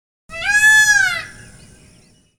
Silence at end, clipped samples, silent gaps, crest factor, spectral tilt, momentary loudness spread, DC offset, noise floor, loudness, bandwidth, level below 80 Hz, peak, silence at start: 1.05 s; under 0.1%; none; 14 dB; 1 dB/octave; 23 LU; under 0.1%; -51 dBFS; -12 LUFS; 17.5 kHz; -48 dBFS; -2 dBFS; 0.3 s